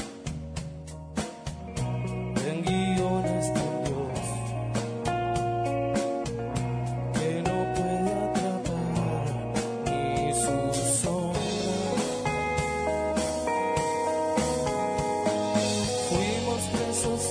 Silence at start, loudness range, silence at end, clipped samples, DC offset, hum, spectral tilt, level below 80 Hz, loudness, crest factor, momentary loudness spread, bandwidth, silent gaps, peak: 0 s; 3 LU; 0 s; under 0.1%; under 0.1%; none; -5 dB/octave; -46 dBFS; -28 LUFS; 16 dB; 6 LU; 11 kHz; none; -12 dBFS